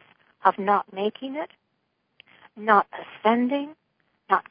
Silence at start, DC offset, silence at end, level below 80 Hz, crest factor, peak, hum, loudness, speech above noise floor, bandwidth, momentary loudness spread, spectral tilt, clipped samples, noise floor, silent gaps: 0.45 s; under 0.1%; 0.1 s; -82 dBFS; 24 dB; -2 dBFS; none; -24 LUFS; 50 dB; 5.2 kHz; 14 LU; -9.5 dB/octave; under 0.1%; -74 dBFS; none